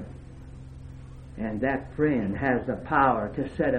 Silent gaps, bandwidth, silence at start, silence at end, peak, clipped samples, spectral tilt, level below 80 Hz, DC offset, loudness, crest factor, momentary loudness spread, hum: none; 9.2 kHz; 0 s; 0 s; -8 dBFS; under 0.1%; -9 dB/octave; -46 dBFS; under 0.1%; -26 LUFS; 20 dB; 22 LU; none